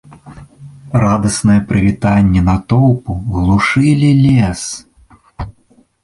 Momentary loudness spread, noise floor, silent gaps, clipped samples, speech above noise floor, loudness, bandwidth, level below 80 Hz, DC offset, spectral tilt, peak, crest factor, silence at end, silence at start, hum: 16 LU; -51 dBFS; none; under 0.1%; 40 dB; -12 LUFS; 11.5 kHz; -30 dBFS; under 0.1%; -6.5 dB/octave; 0 dBFS; 12 dB; 0.55 s; 0.25 s; none